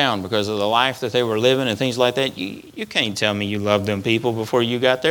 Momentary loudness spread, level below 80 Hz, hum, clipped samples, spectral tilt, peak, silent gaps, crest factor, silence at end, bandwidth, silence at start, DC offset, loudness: 5 LU; -60 dBFS; none; under 0.1%; -4.5 dB/octave; 0 dBFS; none; 20 dB; 0 s; 19 kHz; 0 s; under 0.1%; -20 LUFS